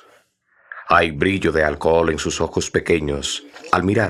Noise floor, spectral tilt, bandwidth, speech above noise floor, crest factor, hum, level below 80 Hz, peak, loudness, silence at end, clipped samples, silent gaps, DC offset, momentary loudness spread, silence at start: -59 dBFS; -4.5 dB/octave; 12.5 kHz; 40 dB; 18 dB; none; -42 dBFS; -2 dBFS; -19 LUFS; 0 s; under 0.1%; none; under 0.1%; 8 LU; 0.7 s